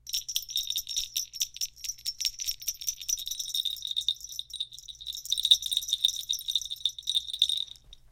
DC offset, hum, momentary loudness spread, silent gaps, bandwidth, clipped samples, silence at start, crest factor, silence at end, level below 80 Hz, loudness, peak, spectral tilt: under 0.1%; none; 11 LU; none; 17 kHz; under 0.1%; 0.05 s; 28 dB; 0.15 s; -60 dBFS; -29 LUFS; -4 dBFS; 4.5 dB/octave